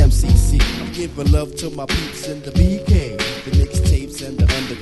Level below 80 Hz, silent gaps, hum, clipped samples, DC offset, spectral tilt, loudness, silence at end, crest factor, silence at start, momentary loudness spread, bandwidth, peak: -18 dBFS; none; none; under 0.1%; under 0.1%; -5.5 dB/octave; -19 LUFS; 0 s; 16 dB; 0 s; 11 LU; 12.5 kHz; 0 dBFS